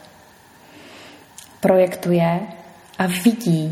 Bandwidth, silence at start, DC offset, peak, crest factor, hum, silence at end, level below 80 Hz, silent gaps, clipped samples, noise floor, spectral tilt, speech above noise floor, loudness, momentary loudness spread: 15.5 kHz; 0.85 s; under 0.1%; -2 dBFS; 18 dB; none; 0 s; -62 dBFS; none; under 0.1%; -48 dBFS; -6.5 dB/octave; 31 dB; -19 LUFS; 24 LU